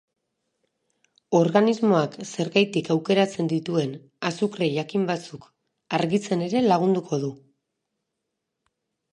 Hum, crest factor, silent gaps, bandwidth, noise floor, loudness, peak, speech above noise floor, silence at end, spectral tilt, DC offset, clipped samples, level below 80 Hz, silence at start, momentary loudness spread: none; 22 dB; none; 10 kHz; -81 dBFS; -24 LUFS; -4 dBFS; 58 dB; 1.75 s; -6 dB/octave; under 0.1%; under 0.1%; -72 dBFS; 1.3 s; 10 LU